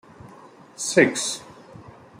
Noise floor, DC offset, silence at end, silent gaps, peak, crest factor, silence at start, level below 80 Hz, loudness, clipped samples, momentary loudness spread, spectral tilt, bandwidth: -47 dBFS; under 0.1%; 0.3 s; none; -2 dBFS; 24 dB; 0.25 s; -66 dBFS; -22 LUFS; under 0.1%; 17 LU; -3 dB/octave; 16 kHz